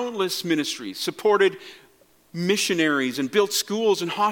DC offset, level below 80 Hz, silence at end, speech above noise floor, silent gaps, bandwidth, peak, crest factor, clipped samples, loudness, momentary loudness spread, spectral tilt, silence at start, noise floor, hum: under 0.1%; -72 dBFS; 0 s; 34 dB; none; 17.5 kHz; -6 dBFS; 18 dB; under 0.1%; -23 LUFS; 8 LU; -3.5 dB/octave; 0 s; -57 dBFS; none